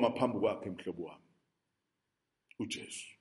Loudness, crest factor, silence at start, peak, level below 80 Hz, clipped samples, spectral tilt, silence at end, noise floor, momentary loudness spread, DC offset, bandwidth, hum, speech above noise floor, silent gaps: -37 LUFS; 24 dB; 0 s; -16 dBFS; -76 dBFS; under 0.1%; -5 dB/octave; 0.1 s; -86 dBFS; 13 LU; under 0.1%; 11.5 kHz; none; 50 dB; none